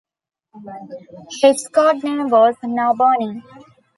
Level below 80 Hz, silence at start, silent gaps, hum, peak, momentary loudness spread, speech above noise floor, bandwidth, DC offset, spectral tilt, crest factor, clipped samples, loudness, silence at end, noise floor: -70 dBFS; 0.55 s; none; none; -2 dBFS; 21 LU; 44 dB; 11.5 kHz; under 0.1%; -4 dB/octave; 16 dB; under 0.1%; -16 LUFS; 0.55 s; -61 dBFS